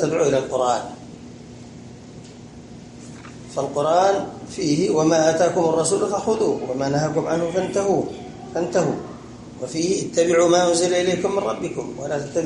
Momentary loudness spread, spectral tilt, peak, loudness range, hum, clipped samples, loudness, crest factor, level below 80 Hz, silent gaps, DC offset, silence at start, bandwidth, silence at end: 23 LU; -4.5 dB/octave; -4 dBFS; 6 LU; none; under 0.1%; -21 LUFS; 18 dB; -54 dBFS; none; under 0.1%; 0 s; 11.5 kHz; 0 s